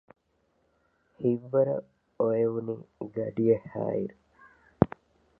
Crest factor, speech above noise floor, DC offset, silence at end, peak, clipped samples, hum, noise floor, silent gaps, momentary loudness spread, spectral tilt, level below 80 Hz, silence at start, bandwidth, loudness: 28 dB; 44 dB; under 0.1%; 0.55 s; -2 dBFS; under 0.1%; none; -72 dBFS; none; 12 LU; -12 dB/octave; -56 dBFS; 1.2 s; 3.8 kHz; -29 LUFS